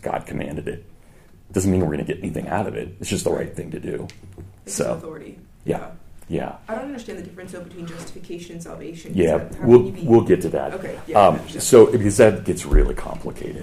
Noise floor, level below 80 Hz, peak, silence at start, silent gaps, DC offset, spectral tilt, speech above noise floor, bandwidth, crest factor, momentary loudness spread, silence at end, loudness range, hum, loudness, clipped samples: -47 dBFS; -32 dBFS; 0 dBFS; 0.05 s; none; under 0.1%; -6 dB/octave; 27 dB; 15.5 kHz; 20 dB; 21 LU; 0 s; 15 LU; none; -20 LUFS; under 0.1%